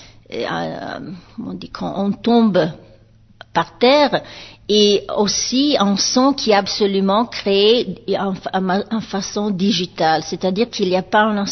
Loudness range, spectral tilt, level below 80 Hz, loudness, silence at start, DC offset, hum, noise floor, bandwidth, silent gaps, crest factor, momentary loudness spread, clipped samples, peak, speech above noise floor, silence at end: 5 LU; -4 dB/octave; -50 dBFS; -17 LUFS; 0 s; under 0.1%; none; -48 dBFS; 6.4 kHz; none; 16 dB; 14 LU; under 0.1%; -2 dBFS; 31 dB; 0 s